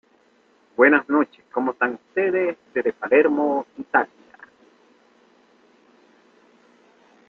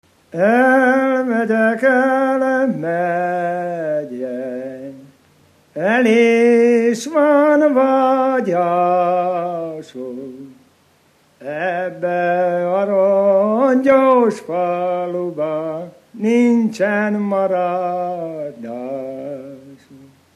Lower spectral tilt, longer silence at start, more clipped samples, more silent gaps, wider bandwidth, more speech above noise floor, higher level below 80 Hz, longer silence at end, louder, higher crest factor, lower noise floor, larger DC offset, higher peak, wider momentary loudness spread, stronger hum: about the same, -7.5 dB/octave vs -6.5 dB/octave; first, 0.8 s vs 0.35 s; neither; neither; second, 4.5 kHz vs 12.5 kHz; about the same, 39 dB vs 40 dB; about the same, -70 dBFS vs -72 dBFS; first, 3.25 s vs 0.4 s; second, -21 LUFS vs -16 LUFS; first, 22 dB vs 16 dB; first, -59 dBFS vs -55 dBFS; neither; about the same, -2 dBFS vs -2 dBFS; second, 10 LU vs 16 LU; first, 60 Hz at -60 dBFS vs none